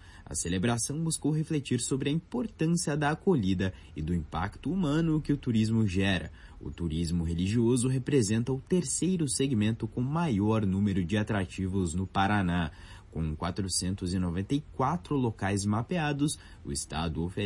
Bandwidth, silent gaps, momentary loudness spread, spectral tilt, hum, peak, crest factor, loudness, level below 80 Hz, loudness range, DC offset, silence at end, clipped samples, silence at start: 11.5 kHz; none; 7 LU; -5.5 dB/octave; none; -14 dBFS; 16 dB; -30 LUFS; -50 dBFS; 3 LU; under 0.1%; 0 s; under 0.1%; 0 s